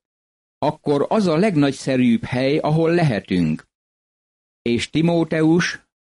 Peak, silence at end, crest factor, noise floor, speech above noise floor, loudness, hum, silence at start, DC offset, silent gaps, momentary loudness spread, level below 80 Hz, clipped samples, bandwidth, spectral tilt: -8 dBFS; 0.25 s; 12 dB; under -90 dBFS; over 72 dB; -19 LUFS; none; 0.6 s; under 0.1%; 3.75-4.65 s; 7 LU; -52 dBFS; under 0.1%; 11.5 kHz; -6.5 dB/octave